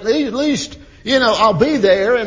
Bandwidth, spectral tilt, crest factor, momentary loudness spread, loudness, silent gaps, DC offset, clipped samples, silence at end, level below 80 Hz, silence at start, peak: 7.6 kHz; -4.5 dB/octave; 14 dB; 10 LU; -15 LUFS; none; under 0.1%; under 0.1%; 0 s; -44 dBFS; 0 s; 0 dBFS